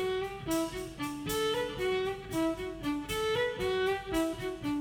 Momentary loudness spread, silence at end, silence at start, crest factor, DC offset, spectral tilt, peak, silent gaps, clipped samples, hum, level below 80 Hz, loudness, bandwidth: 5 LU; 0 s; 0 s; 14 dB; under 0.1%; -4.5 dB/octave; -18 dBFS; none; under 0.1%; none; -52 dBFS; -33 LUFS; over 20 kHz